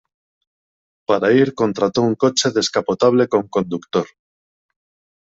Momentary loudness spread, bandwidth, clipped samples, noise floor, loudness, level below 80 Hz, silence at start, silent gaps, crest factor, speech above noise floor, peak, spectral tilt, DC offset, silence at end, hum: 8 LU; 8 kHz; under 0.1%; under -90 dBFS; -18 LUFS; -60 dBFS; 1.1 s; none; 16 dB; over 73 dB; -2 dBFS; -4.5 dB/octave; under 0.1%; 1.25 s; none